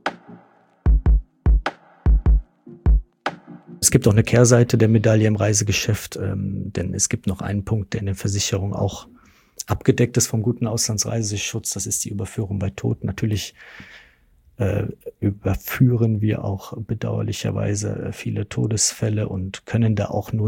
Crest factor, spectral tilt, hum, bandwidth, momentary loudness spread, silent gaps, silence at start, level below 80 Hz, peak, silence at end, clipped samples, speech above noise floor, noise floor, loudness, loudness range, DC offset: 20 dB; -5 dB/octave; none; 17 kHz; 11 LU; none; 0.05 s; -28 dBFS; 0 dBFS; 0 s; under 0.1%; 35 dB; -56 dBFS; -21 LUFS; 7 LU; under 0.1%